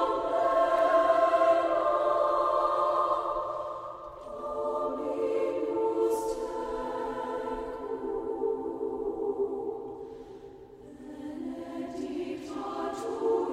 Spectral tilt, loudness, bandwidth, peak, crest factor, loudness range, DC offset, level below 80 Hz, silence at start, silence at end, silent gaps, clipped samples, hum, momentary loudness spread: -5 dB/octave; -29 LUFS; 14 kHz; -12 dBFS; 18 dB; 12 LU; under 0.1%; -58 dBFS; 0 s; 0 s; none; under 0.1%; none; 17 LU